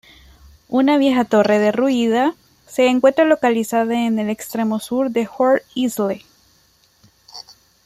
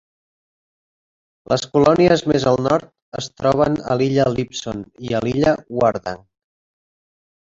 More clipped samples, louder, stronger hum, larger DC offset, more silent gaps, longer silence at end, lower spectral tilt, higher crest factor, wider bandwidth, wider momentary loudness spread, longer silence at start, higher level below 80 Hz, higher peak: neither; about the same, -17 LUFS vs -18 LUFS; neither; neither; second, none vs 3.02-3.12 s; second, 0.45 s vs 1.3 s; about the same, -5 dB/octave vs -6 dB/octave; about the same, 16 dB vs 18 dB; first, 15.5 kHz vs 8 kHz; second, 9 LU vs 15 LU; second, 0.7 s vs 1.5 s; second, -58 dBFS vs -48 dBFS; about the same, -2 dBFS vs -2 dBFS